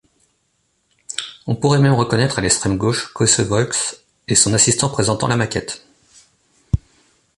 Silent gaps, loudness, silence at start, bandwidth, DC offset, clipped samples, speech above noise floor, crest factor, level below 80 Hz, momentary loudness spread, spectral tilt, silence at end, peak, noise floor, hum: none; -17 LUFS; 1.1 s; 11.5 kHz; under 0.1%; under 0.1%; 49 dB; 18 dB; -38 dBFS; 13 LU; -4 dB/octave; 0.6 s; 0 dBFS; -66 dBFS; none